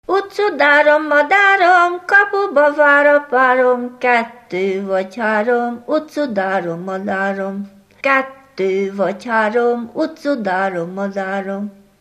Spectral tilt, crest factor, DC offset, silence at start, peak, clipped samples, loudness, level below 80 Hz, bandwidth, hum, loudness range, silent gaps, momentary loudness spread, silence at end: -5.5 dB/octave; 16 dB; under 0.1%; 0.1 s; 0 dBFS; under 0.1%; -15 LUFS; -66 dBFS; 12.5 kHz; none; 8 LU; none; 12 LU; 0.3 s